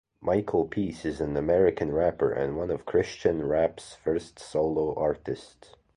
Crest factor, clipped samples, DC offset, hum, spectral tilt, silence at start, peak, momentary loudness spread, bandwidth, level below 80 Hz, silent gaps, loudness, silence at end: 18 dB; under 0.1%; under 0.1%; none; -7 dB/octave; 0.2 s; -8 dBFS; 8 LU; 11 kHz; -50 dBFS; none; -28 LUFS; 0.5 s